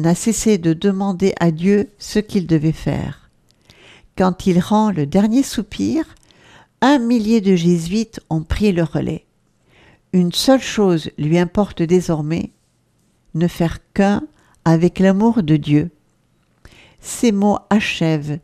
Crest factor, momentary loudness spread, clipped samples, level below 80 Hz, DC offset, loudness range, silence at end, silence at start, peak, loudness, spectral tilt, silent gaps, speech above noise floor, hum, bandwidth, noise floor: 18 dB; 8 LU; under 0.1%; -40 dBFS; under 0.1%; 2 LU; 0.05 s; 0 s; 0 dBFS; -17 LUFS; -6 dB/octave; none; 44 dB; none; 14.5 kHz; -60 dBFS